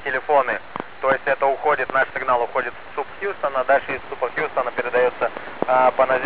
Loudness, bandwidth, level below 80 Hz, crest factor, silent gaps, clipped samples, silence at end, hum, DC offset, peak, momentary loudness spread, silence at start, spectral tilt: -21 LUFS; 4 kHz; -58 dBFS; 18 dB; none; under 0.1%; 0 s; none; 1%; -2 dBFS; 10 LU; 0 s; -7.5 dB/octave